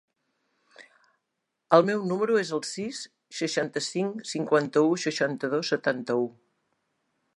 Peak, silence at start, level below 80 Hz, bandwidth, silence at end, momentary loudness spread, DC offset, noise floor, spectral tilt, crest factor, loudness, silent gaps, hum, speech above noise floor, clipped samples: -4 dBFS; 0.8 s; -80 dBFS; 11.5 kHz; 1.05 s; 11 LU; under 0.1%; -82 dBFS; -4.5 dB/octave; 24 dB; -26 LUFS; none; none; 56 dB; under 0.1%